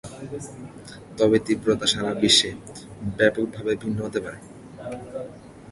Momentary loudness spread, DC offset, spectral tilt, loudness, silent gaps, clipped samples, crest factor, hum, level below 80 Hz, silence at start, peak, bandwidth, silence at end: 23 LU; under 0.1%; -3.5 dB/octave; -22 LUFS; none; under 0.1%; 22 dB; none; -52 dBFS; 0.05 s; -4 dBFS; 11.5 kHz; 0 s